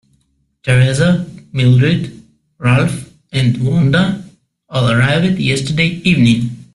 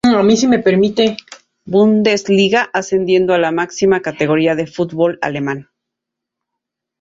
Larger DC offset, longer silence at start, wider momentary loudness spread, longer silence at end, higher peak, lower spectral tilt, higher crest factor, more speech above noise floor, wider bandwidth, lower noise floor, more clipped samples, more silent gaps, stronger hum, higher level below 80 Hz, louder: neither; first, 0.65 s vs 0.05 s; first, 11 LU vs 8 LU; second, 0.1 s vs 1.4 s; about the same, 0 dBFS vs 0 dBFS; first, -6.5 dB/octave vs -5 dB/octave; about the same, 14 dB vs 14 dB; second, 48 dB vs 67 dB; first, 11.5 kHz vs 7.8 kHz; second, -60 dBFS vs -81 dBFS; neither; neither; neither; first, -42 dBFS vs -54 dBFS; about the same, -14 LUFS vs -14 LUFS